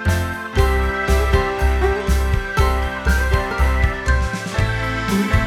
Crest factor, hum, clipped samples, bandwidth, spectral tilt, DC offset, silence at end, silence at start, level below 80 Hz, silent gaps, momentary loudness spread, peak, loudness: 14 dB; none; under 0.1%; 15 kHz; -5.5 dB/octave; under 0.1%; 0 s; 0 s; -20 dBFS; none; 3 LU; -2 dBFS; -19 LUFS